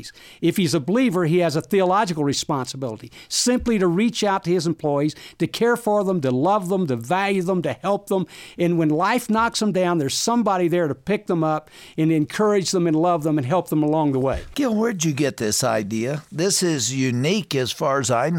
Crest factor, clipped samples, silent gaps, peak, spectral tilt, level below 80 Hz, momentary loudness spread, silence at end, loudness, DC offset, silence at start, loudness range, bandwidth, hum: 14 dB; under 0.1%; none; -6 dBFS; -5 dB/octave; -50 dBFS; 6 LU; 0 s; -21 LUFS; under 0.1%; 0 s; 1 LU; 17 kHz; none